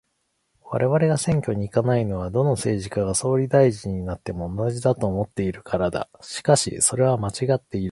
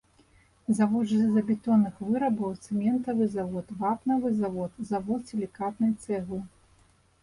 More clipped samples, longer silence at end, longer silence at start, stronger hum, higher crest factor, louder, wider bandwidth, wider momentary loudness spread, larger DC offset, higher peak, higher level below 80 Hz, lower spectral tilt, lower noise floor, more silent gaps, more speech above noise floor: neither; second, 0 s vs 0.75 s; about the same, 0.65 s vs 0.7 s; neither; about the same, 20 dB vs 16 dB; first, -23 LUFS vs -28 LUFS; about the same, 11.5 kHz vs 11 kHz; about the same, 10 LU vs 10 LU; neither; first, -4 dBFS vs -12 dBFS; first, -46 dBFS vs -62 dBFS; second, -5.5 dB/octave vs -8 dB/octave; first, -72 dBFS vs -62 dBFS; neither; first, 50 dB vs 35 dB